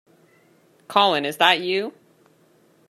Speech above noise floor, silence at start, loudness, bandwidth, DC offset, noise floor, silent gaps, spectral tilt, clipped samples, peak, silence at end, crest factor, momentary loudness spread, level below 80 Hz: 38 dB; 0.9 s; -19 LUFS; 14.5 kHz; under 0.1%; -58 dBFS; none; -3 dB/octave; under 0.1%; -2 dBFS; 1 s; 22 dB; 8 LU; -78 dBFS